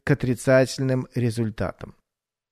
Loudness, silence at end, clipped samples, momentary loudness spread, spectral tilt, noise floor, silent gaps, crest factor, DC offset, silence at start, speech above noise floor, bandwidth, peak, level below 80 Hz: -23 LUFS; 0.6 s; under 0.1%; 14 LU; -6.5 dB/octave; -86 dBFS; none; 18 dB; under 0.1%; 0.05 s; 64 dB; 13.5 kHz; -6 dBFS; -48 dBFS